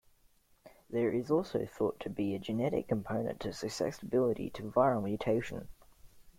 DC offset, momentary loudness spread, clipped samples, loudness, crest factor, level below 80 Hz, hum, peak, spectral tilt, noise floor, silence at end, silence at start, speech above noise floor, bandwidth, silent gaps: under 0.1%; 8 LU; under 0.1%; -34 LUFS; 20 dB; -60 dBFS; none; -14 dBFS; -6.5 dB/octave; -67 dBFS; 0.1 s; 0.65 s; 34 dB; 16.5 kHz; none